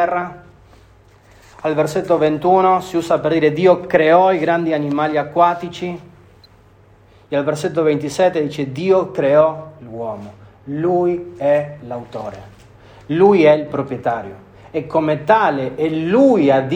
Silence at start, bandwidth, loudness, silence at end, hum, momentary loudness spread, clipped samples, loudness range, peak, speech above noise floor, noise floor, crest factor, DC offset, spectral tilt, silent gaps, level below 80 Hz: 0 s; 15.5 kHz; -16 LUFS; 0 s; none; 15 LU; under 0.1%; 6 LU; 0 dBFS; 32 dB; -48 dBFS; 16 dB; under 0.1%; -7 dB/octave; none; -54 dBFS